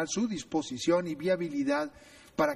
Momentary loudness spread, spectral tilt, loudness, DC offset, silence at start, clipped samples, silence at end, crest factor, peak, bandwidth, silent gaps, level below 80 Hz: 5 LU; -4.5 dB/octave; -31 LUFS; under 0.1%; 0 s; under 0.1%; 0 s; 18 dB; -12 dBFS; 14 kHz; none; -64 dBFS